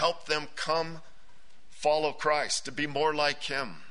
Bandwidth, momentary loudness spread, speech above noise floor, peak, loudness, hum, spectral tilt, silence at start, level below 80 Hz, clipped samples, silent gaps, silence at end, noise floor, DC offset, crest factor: 11 kHz; 6 LU; 31 dB; -10 dBFS; -29 LUFS; none; -2.5 dB/octave; 0 s; -62 dBFS; under 0.1%; none; 0.1 s; -61 dBFS; 1%; 20 dB